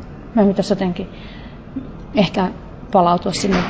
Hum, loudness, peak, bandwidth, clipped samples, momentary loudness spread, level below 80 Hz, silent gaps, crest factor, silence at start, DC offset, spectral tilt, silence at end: none; -18 LUFS; -2 dBFS; 8 kHz; under 0.1%; 19 LU; -40 dBFS; none; 16 dB; 0 s; under 0.1%; -6 dB/octave; 0 s